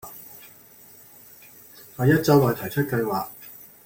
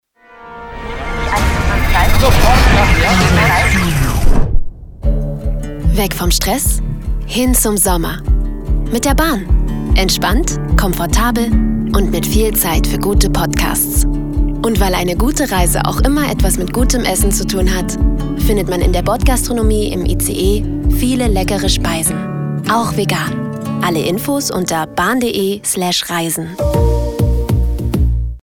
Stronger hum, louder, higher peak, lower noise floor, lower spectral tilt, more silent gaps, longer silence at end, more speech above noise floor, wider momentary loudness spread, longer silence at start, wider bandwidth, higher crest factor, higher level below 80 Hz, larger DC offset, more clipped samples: neither; second, -22 LUFS vs -15 LUFS; second, -4 dBFS vs 0 dBFS; first, -49 dBFS vs -38 dBFS; first, -6.5 dB/octave vs -4.5 dB/octave; neither; first, 0.2 s vs 0.05 s; first, 29 dB vs 24 dB; first, 27 LU vs 8 LU; second, 0.05 s vs 0.35 s; second, 17 kHz vs 20 kHz; first, 20 dB vs 14 dB; second, -56 dBFS vs -16 dBFS; neither; neither